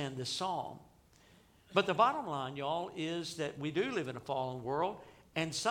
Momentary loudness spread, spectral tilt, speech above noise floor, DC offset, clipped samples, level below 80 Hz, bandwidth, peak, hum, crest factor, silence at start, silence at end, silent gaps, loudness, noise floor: 9 LU; -4.5 dB/octave; 28 dB; under 0.1%; under 0.1%; -70 dBFS; 17 kHz; -14 dBFS; none; 22 dB; 0 s; 0 s; none; -36 LUFS; -64 dBFS